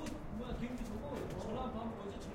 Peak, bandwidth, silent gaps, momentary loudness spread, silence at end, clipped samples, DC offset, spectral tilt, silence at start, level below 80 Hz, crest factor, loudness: -30 dBFS; 16.5 kHz; none; 3 LU; 0 s; under 0.1%; under 0.1%; -6.5 dB/octave; 0 s; -50 dBFS; 12 dB; -43 LUFS